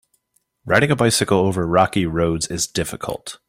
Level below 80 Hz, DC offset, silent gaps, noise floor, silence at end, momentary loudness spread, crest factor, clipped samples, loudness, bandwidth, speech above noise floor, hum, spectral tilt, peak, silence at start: -46 dBFS; under 0.1%; none; -67 dBFS; 0.15 s; 9 LU; 20 dB; under 0.1%; -19 LUFS; 16.5 kHz; 48 dB; none; -4.5 dB/octave; 0 dBFS; 0.65 s